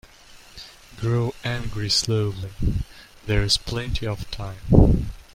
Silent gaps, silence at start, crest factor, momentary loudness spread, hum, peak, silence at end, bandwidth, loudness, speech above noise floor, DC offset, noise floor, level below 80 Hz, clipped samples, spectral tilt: none; 0.3 s; 22 dB; 21 LU; none; -2 dBFS; 0.15 s; 16 kHz; -23 LUFS; 26 dB; under 0.1%; -48 dBFS; -30 dBFS; under 0.1%; -5 dB/octave